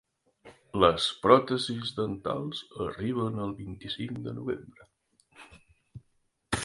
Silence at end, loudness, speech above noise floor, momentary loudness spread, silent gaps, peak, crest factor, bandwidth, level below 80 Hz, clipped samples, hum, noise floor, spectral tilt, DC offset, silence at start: 0 s; -29 LUFS; 44 dB; 15 LU; none; -4 dBFS; 26 dB; 11.5 kHz; -56 dBFS; under 0.1%; none; -73 dBFS; -5 dB/octave; under 0.1%; 0.45 s